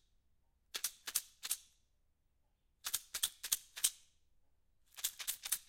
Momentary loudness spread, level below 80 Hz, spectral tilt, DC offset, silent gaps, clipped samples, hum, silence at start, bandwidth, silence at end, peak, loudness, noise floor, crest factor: 6 LU; -76 dBFS; 3.5 dB/octave; under 0.1%; none; under 0.1%; none; 0.75 s; 17 kHz; 0.05 s; -12 dBFS; -39 LUFS; -78 dBFS; 32 dB